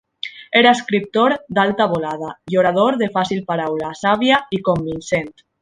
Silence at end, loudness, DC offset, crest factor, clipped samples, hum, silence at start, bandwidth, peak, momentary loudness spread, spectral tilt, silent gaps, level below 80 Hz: 0.3 s; -17 LUFS; under 0.1%; 16 dB; under 0.1%; none; 0.25 s; 10.5 kHz; -2 dBFS; 9 LU; -5 dB/octave; none; -54 dBFS